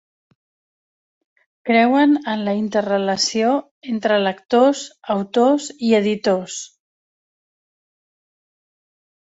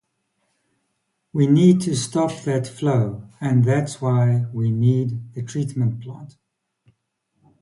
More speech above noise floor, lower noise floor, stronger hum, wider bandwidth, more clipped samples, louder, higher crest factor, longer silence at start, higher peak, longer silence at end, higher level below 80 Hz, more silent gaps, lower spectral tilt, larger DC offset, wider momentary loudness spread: first, over 72 dB vs 54 dB; first, under -90 dBFS vs -74 dBFS; neither; second, 8 kHz vs 11.5 kHz; neither; about the same, -18 LUFS vs -20 LUFS; about the same, 18 dB vs 18 dB; first, 1.65 s vs 1.35 s; about the same, -4 dBFS vs -4 dBFS; first, 2.7 s vs 1.35 s; second, -66 dBFS vs -58 dBFS; first, 3.71-3.81 s vs none; second, -4.5 dB/octave vs -7.5 dB/octave; neither; second, 11 LU vs 14 LU